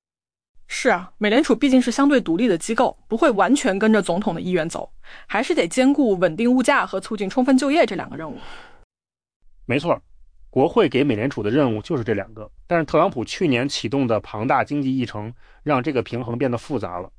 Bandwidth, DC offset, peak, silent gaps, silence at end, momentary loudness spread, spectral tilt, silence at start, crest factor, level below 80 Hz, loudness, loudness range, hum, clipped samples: 10.5 kHz; under 0.1%; -6 dBFS; 8.84-8.90 s, 9.36-9.40 s; 0.1 s; 11 LU; -5.5 dB/octave; 0.55 s; 16 dB; -48 dBFS; -20 LUFS; 5 LU; none; under 0.1%